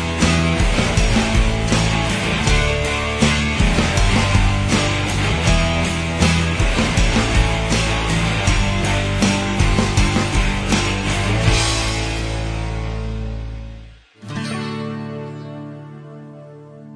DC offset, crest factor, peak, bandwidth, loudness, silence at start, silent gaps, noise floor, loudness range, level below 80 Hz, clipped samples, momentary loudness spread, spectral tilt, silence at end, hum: under 0.1%; 16 dB; -2 dBFS; 11 kHz; -18 LUFS; 0 s; none; -39 dBFS; 10 LU; -24 dBFS; under 0.1%; 14 LU; -4.5 dB/octave; 0 s; none